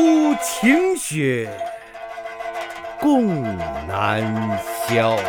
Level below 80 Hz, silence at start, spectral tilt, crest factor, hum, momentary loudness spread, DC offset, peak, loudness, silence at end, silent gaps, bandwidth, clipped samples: -50 dBFS; 0 s; -5 dB/octave; 18 dB; none; 14 LU; under 0.1%; -2 dBFS; -21 LUFS; 0 s; none; 20 kHz; under 0.1%